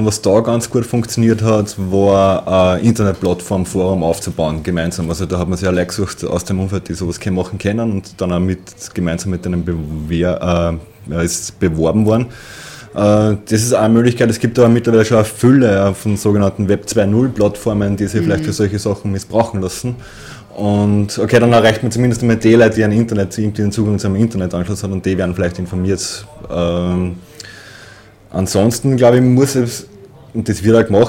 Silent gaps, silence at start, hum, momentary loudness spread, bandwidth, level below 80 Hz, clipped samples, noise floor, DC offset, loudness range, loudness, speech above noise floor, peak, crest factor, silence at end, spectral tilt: none; 0 s; none; 10 LU; 16.5 kHz; -38 dBFS; under 0.1%; -40 dBFS; under 0.1%; 6 LU; -15 LUFS; 26 dB; 0 dBFS; 14 dB; 0 s; -6 dB/octave